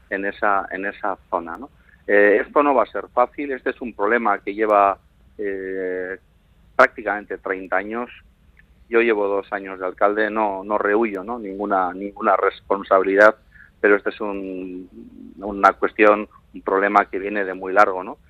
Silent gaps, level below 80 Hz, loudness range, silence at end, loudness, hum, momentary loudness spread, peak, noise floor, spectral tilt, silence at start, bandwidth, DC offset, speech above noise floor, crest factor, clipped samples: none; -54 dBFS; 4 LU; 0.15 s; -20 LUFS; none; 14 LU; 0 dBFS; -54 dBFS; -6 dB/octave; 0.1 s; 8.4 kHz; under 0.1%; 34 dB; 20 dB; under 0.1%